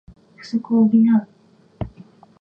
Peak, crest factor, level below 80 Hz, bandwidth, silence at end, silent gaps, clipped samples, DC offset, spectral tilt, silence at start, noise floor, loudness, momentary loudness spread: -6 dBFS; 14 dB; -48 dBFS; 6 kHz; 0.5 s; none; under 0.1%; under 0.1%; -8.5 dB/octave; 0.45 s; -47 dBFS; -18 LUFS; 19 LU